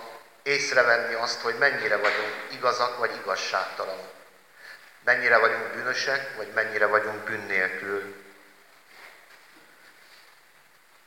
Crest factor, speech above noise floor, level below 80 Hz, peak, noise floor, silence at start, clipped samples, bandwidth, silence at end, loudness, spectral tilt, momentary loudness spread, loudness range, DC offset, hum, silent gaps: 22 dB; 32 dB; -82 dBFS; -6 dBFS; -58 dBFS; 0 s; under 0.1%; 17 kHz; 1.95 s; -25 LUFS; -2 dB/octave; 14 LU; 8 LU; under 0.1%; none; none